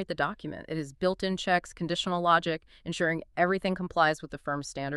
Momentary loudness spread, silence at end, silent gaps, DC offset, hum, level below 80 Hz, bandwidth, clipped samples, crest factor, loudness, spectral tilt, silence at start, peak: 11 LU; 0 s; none; under 0.1%; none; -56 dBFS; 12 kHz; under 0.1%; 20 dB; -29 LUFS; -5 dB/octave; 0 s; -8 dBFS